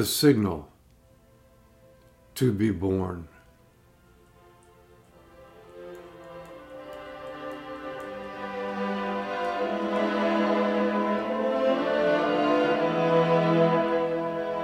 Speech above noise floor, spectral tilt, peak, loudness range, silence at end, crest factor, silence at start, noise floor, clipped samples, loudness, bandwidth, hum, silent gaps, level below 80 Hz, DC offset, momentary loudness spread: 34 dB; -5.5 dB/octave; -8 dBFS; 19 LU; 0 s; 18 dB; 0 s; -58 dBFS; under 0.1%; -26 LUFS; 16 kHz; none; none; -60 dBFS; under 0.1%; 21 LU